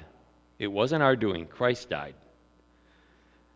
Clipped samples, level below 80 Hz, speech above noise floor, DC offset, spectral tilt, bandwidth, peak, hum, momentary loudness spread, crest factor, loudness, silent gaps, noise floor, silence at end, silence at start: under 0.1%; -58 dBFS; 35 dB; under 0.1%; -6 dB/octave; 8 kHz; -8 dBFS; none; 12 LU; 24 dB; -28 LUFS; none; -62 dBFS; 1.45 s; 0 s